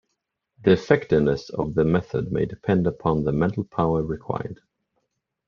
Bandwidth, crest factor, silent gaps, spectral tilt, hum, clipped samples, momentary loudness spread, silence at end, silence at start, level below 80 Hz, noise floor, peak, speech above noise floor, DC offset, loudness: 7 kHz; 22 dB; none; -8.5 dB/octave; none; under 0.1%; 9 LU; 0.95 s; 0.6 s; -48 dBFS; -79 dBFS; -2 dBFS; 57 dB; under 0.1%; -23 LUFS